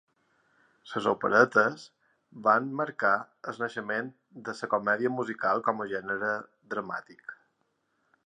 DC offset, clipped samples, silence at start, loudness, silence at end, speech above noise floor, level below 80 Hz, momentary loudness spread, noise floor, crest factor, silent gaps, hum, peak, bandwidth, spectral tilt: under 0.1%; under 0.1%; 0.85 s; -28 LUFS; 0.95 s; 47 dB; -78 dBFS; 17 LU; -76 dBFS; 24 dB; none; none; -6 dBFS; 10 kHz; -5.5 dB/octave